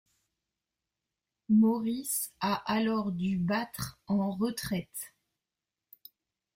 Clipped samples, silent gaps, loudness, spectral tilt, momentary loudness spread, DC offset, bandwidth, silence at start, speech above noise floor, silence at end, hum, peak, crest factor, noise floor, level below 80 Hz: under 0.1%; none; -30 LUFS; -5 dB/octave; 13 LU; under 0.1%; 16 kHz; 1.5 s; 60 dB; 1.45 s; none; -16 dBFS; 16 dB; -90 dBFS; -64 dBFS